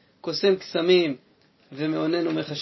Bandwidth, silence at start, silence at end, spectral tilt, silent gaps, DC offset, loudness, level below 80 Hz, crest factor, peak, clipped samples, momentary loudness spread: 6 kHz; 0.25 s; 0 s; -6 dB/octave; none; under 0.1%; -24 LUFS; -74 dBFS; 18 dB; -8 dBFS; under 0.1%; 11 LU